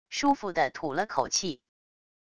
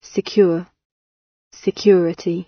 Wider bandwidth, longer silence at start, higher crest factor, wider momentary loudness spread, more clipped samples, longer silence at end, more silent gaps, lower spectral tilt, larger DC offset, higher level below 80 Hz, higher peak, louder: first, 11 kHz vs 6.6 kHz; about the same, 0.1 s vs 0.15 s; about the same, 20 dB vs 18 dB; second, 7 LU vs 11 LU; neither; first, 0.8 s vs 0.05 s; second, none vs 0.85-1.51 s; second, -2.5 dB/octave vs -6.5 dB/octave; neither; about the same, -62 dBFS vs -62 dBFS; second, -10 dBFS vs -2 dBFS; second, -29 LUFS vs -18 LUFS